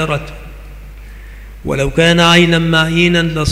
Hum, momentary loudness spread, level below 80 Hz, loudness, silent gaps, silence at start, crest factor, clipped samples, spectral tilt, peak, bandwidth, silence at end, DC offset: none; 18 LU; -30 dBFS; -11 LUFS; none; 0 s; 14 dB; under 0.1%; -5 dB/octave; 0 dBFS; 15 kHz; 0 s; under 0.1%